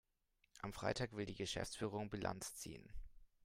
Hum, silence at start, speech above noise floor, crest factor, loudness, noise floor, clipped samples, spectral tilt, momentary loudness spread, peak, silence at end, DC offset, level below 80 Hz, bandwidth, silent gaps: none; 0.55 s; 36 dB; 20 dB; -46 LUFS; -82 dBFS; under 0.1%; -4 dB/octave; 12 LU; -26 dBFS; 0.2 s; under 0.1%; -60 dBFS; 16 kHz; none